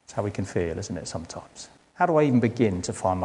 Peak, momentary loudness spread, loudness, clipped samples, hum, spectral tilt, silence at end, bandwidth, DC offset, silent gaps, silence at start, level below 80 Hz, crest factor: -8 dBFS; 19 LU; -25 LUFS; under 0.1%; none; -6 dB/octave; 0 s; 11 kHz; under 0.1%; none; 0.1 s; -56 dBFS; 18 dB